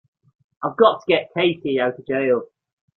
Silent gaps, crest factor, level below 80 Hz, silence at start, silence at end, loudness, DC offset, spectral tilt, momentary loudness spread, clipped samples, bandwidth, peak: none; 20 dB; -64 dBFS; 0.6 s; 0.5 s; -20 LUFS; under 0.1%; -7 dB/octave; 7 LU; under 0.1%; 6 kHz; -2 dBFS